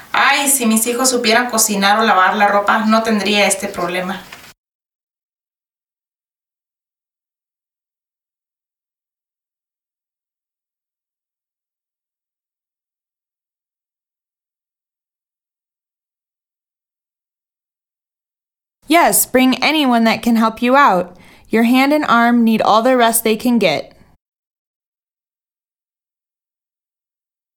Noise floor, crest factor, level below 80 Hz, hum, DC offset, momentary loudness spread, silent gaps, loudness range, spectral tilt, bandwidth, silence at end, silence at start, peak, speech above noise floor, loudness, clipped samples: under -90 dBFS; 18 dB; -58 dBFS; none; under 0.1%; 8 LU; 4.58-4.64 s, 4.75-4.80 s, 4.95-5.07 s, 5.23-5.30 s, 6.15-6.19 s; 9 LU; -3 dB/octave; 19 kHz; 3.75 s; 0.15 s; 0 dBFS; over 77 dB; -13 LUFS; under 0.1%